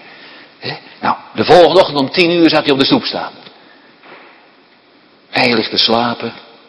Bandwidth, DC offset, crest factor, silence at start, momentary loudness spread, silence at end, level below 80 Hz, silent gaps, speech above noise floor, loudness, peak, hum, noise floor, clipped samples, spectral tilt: 11 kHz; under 0.1%; 14 dB; 0.6 s; 17 LU; 0.3 s; -52 dBFS; none; 35 dB; -12 LUFS; 0 dBFS; none; -48 dBFS; 0.5%; -5.5 dB/octave